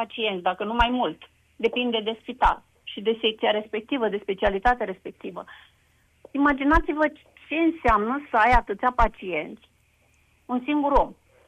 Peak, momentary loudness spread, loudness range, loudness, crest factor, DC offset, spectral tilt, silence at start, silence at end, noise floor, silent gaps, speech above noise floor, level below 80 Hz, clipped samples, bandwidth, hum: -4 dBFS; 13 LU; 4 LU; -24 LUFS; 20 dB; under 0.1%; -6 dB/octave; 0 s; 0.35 s; -63 dBFS; none; 39 dB; -36 dBFS; under 0.1%; 9.6 kHz; none